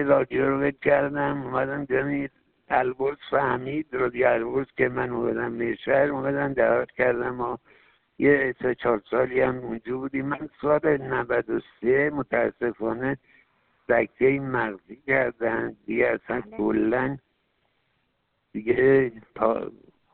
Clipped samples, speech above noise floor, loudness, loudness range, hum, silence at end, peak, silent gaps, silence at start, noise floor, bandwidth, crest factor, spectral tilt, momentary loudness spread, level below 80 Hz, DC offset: under 0.1%; 49 dB; -25 LUFS; 2 LU; none; 0.45 s; -6 dBFS; none; 0 s; -73 dBFS; 4.3 kHz; 18 dB; -11 dB/octave; 9 LU; -56 dBFS; under 0.1%